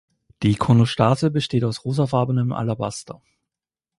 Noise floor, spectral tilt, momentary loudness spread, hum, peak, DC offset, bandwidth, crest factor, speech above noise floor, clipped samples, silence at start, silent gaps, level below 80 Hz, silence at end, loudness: -88 dBFS; -7 dB/octave; 10 LU; none; -2 dBFS; under 0.1%; 11.5 kHz; 20 dB; 68 dB; under 0.1%; 0.4 s; none; -50 dBFS; 0.85 s; -21 LUFS